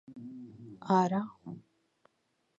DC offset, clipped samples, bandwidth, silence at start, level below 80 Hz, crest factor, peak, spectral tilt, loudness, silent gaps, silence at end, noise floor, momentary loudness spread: under 0.1%; under 0.1%; 7.8 kHz; 0.1 s; -80 dBFS; 22 dB; -12 dBFS; -7.5 dB/octave; -30 LUFS; none; 1 s; -77 dBFS; 21 LU